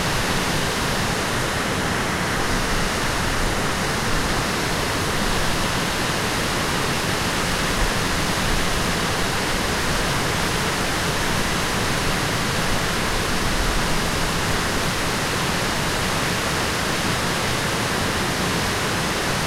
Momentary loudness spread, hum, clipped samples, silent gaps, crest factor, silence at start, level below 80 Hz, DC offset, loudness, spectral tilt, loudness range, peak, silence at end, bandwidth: 1 LU; none; under 0.1%; none; 14 dB; 0 s; -32 dBFS; under 0.1%; -21 LUFS; -3.5 dB/octave; 1 LU; -8 dBFS; 0 s; 16 kHz